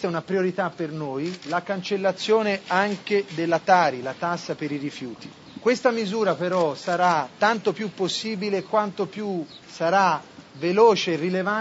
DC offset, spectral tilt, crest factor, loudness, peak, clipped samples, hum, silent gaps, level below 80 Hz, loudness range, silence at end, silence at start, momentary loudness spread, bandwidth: under 0.1%; -5 dB/octave; 18 dB; -24 LUFS; -6 dBFS; under 0.1%; none; none; -70 dBFS; 2 LU; 0 s; 0 s; 10 LU; 8 kHz